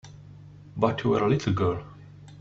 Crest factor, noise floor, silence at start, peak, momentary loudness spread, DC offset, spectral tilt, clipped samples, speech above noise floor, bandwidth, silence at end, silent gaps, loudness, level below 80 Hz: 20 dB; -47 dBFS; 0.05 s; -6 dBFS; 23 LU; under 0.1%; -7.5 dB/octave; under 0.1%; 22 dB; 7.8 kHz; 0 s; none; -26 LUFS; -54 dBFS